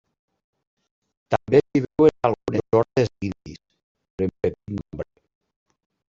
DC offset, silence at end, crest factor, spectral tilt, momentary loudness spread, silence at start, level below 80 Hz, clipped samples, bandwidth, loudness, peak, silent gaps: under 0.1%; 1.05 s; 22 dB; -8 dB/octave; 18 LU; 1.3 s; -52 dBFS; under 0.1%; 7.6 kHz; -22 LUFS; -2 dBFS; 3.83-3.95 s, 4.10-4.18 s